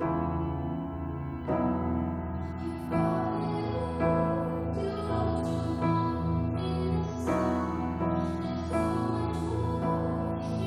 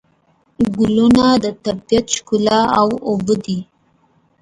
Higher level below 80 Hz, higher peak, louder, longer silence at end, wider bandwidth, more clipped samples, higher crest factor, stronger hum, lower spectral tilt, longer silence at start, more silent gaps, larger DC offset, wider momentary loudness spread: about the same, -44 dBFS vs -44 dBFS; second, -16 dBFS vs 0 dBFS; second, -30 LUFS vs -16 LUFS; second, 0 s vs 0.8 s; about the same, 12 kHz vs 11 kHz; neither; about the same, 14 dB vs 16 dB; neither; first, -8.5 dB/octave vs -5 dB/octave; second, 0 s vs 0.6 s; neither; neither; second, 6 LU vs 10 LU